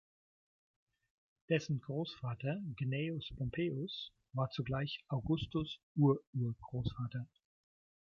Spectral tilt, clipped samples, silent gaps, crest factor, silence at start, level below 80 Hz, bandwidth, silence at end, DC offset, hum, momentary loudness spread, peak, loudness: -7.5 dB/octave; under 0.1%; 5.83-5.95 s, 6.27-6.33 s; 20 dB; 1.5 s; -60 dBFS; 7 kHz; 0.75 s; under 0.1%; none; 10 LU; -20 dBFS; -39 LUFS